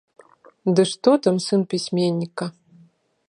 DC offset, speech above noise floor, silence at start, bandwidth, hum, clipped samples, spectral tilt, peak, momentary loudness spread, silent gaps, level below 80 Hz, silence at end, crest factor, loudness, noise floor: under 0.1%; 36 dB; 0.65 s; 11 kHz; none; under 0.1%; -6 dB/octave; -2 dBFS; 11 LU; none; -72 dBFS; 0.8 s; 20 dB; -21 LUFS; -56 dBFS